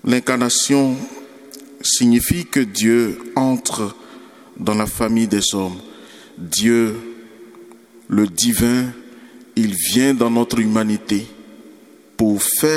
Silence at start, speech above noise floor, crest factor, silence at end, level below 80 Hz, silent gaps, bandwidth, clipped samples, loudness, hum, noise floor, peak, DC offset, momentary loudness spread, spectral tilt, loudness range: 0.05 s; 28 dB; 18 dB; 0 s; -46 dBFS; none; 17 kHz; under 0.1%; -17 LUFS; none; -45 dBFS; 0 dBFS; under 0.1%; 18 LU; -3.5 dB/octave; 3 LU